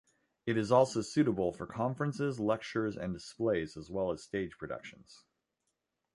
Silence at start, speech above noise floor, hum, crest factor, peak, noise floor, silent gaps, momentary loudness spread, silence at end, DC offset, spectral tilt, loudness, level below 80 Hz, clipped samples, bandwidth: 0.45 s; 51 dB; none; 22 dB; -12 dBFS; -84 dBFS; none; 13 LU; 1 s; under 0.1%; -6.5 dB/octave; -34 LUFS; -62 dBFS; under 0.1%; 11.5 kHz